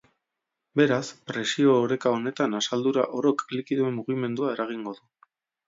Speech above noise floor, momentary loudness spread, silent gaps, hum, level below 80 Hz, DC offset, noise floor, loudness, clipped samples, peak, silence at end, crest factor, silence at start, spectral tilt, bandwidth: 59 dB; 10 LU; none; none; -76 dBFS; under 0.1%; -84 dBFS; -26 LUFS; under 0.1%; -8 dBFS; 0.75 s; 20 dB; 0.75 s; -5 dB/octave; 7.8 kHz